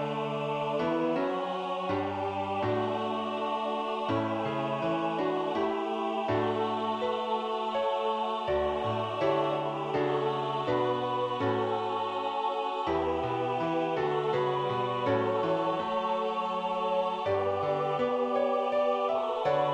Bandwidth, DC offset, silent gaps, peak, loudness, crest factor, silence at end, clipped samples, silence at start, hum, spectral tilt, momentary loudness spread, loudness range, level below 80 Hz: 9.8 kHz; under 0.1%; none; -14 dBFS; -30 LUFS; 14 dB; 0 s; under 0.1%; 0 s; none; -7 dB/octave; 3 LU; 2 LU; -62 dBFS